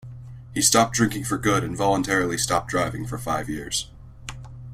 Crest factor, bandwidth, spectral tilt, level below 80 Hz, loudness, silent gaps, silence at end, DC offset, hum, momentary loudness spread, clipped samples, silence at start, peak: 20 dB; 16 kHz; -3.5 dB/octave; -46 dBFS; -23 LUFS; none; 0 s; under 0.1%; none; 21 LU; under 0.1%; 0.05 s; -4 dBFS